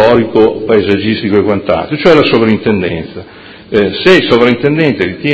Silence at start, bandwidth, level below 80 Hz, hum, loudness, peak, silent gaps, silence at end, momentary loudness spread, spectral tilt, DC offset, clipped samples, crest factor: 0 s; 8 kHz; -38 dBFS; none; -10 LUFS; 0 dBFS; none; 0 s; 8 LU; -7 dB/octave; under 0.1%; 1%; 10 dB